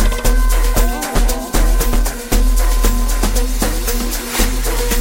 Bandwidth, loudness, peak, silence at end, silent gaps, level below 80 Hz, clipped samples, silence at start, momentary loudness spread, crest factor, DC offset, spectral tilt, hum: 17 kHz; -17 LUFS; 0 dBFS; 0 s; none; -14 dBFS; under 0.1%; 0 s; 3 LU; 14 dB; under 0.1%; -4 dB/octave; none